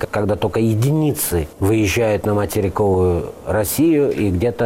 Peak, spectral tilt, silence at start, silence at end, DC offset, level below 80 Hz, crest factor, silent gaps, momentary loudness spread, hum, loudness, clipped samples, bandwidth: -8 dBFS; -6 dB/octave; 0 s; 0 s; under 0.1%; -38 dBFS; 10 dB; none; 5 LU; none; -18 LUFS; under 0.1%; 17 kHz